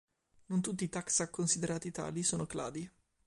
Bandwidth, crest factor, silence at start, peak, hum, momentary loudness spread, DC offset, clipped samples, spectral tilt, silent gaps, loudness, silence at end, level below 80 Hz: 11.5 kHz; 20 dB; 0.5 s; -18 dBFS; none; 9 LU; under 0.1%; under 0.1%; -4 dB/octave; none; -35 LUFS; 0.35 s; -66 dBFS